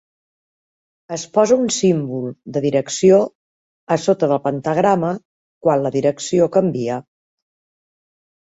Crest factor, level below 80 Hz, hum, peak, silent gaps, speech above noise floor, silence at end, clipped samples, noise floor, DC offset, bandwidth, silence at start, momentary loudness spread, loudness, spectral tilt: 18 dB; -62 dBFS; none; -2 dBFS; 3.35-3.87 s, 5.25-5.61 s; over 73 dB; 1.55 s; under 0.1%; under -90 dBFS; under 0.1%; 8 kHz; 1.1 s; 11 LU; -18 LUFS; -5.5 dB/octave